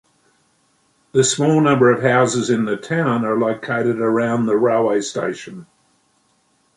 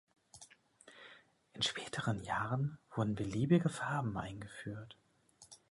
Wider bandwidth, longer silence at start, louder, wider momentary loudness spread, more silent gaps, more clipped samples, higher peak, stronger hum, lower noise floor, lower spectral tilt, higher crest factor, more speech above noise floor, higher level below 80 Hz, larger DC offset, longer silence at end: about the same, 11.5 kHz vs 11.5 kHz; first, 1.15 s vs 0.35 s; first, -17 LUFS vs -37 LUFS; second, 8 LU vs 25 LU; neither; neither; first, -2 dBFS vs -18 dBFS; neither; second, -62 dBFS vs -66 dBFS; about the same, -5 dB/octave vs -5.5 dB/octave; second, 16 dB vs 22 dB; first, 45 dB vs 29 dB; about the same, -62 dBFS vs -64 dBFS; neither; first, 1.15 s vs 0.15 s